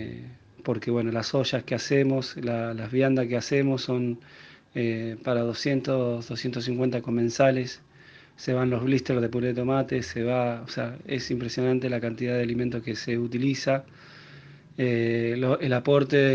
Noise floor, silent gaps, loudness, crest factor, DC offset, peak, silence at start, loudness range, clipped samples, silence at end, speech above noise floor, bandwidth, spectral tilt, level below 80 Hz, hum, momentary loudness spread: -52 dBFS; none; -26 LUFS; 18 dB; under 0.1%; -8 dBFS; 0 s; 2 LU; under 0.1%; 0 s; 27 dB; 7.6 kHz; -6.5 dB/octave; -60 dBFS; none; 9 LU